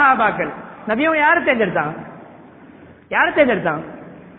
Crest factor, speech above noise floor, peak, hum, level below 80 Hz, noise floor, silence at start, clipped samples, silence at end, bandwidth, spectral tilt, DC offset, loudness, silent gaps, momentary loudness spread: 18 dB; 25 dB; -2 dBFS; none; -54 dBFS; -43 dBFS; 0 s; under 0.1%; 0.05 s; 4.3 kHz; -9 dB/octave; under 0.1%; -17 LUFS; none; 19 LU